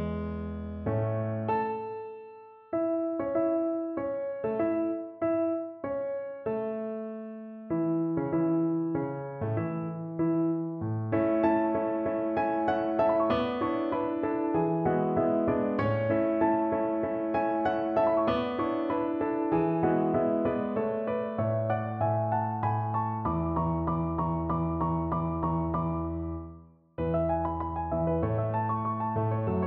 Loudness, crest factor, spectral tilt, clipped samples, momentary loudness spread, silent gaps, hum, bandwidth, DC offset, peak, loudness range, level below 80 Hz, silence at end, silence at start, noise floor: -29 LUFS; 16 dB; -11 dB/octave; under 0.1%; 8 LU; none; none; 4.6 kHz; under 0.1%; -14 dBFS; 4 LU; -50 dBFS; 0 s; 0 s; -51 dBFS